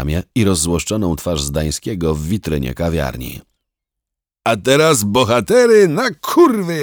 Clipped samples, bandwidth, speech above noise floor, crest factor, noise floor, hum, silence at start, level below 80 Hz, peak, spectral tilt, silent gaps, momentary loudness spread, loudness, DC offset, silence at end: under 0.1%; over 20 kHz; 68 dB; 14 dB; -83 dBFS; none; 0 s; -34 dBFS; -2 dBFS; -5 dB/octave; none; 10 LU; -15 LUFS; under 0.1%; 0 s